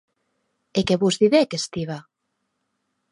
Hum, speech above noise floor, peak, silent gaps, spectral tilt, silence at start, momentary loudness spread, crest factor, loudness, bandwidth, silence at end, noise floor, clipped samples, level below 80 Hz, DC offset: none; 56 dB; -4 dBFS; none; -5 dB/octave; 0.75 s; 14 LU; 20 dB; -21 LUFS; 11.5 kHz; 1.1 s; -76 dBFS; under 0.1%; -58 dBFS; under 0.1%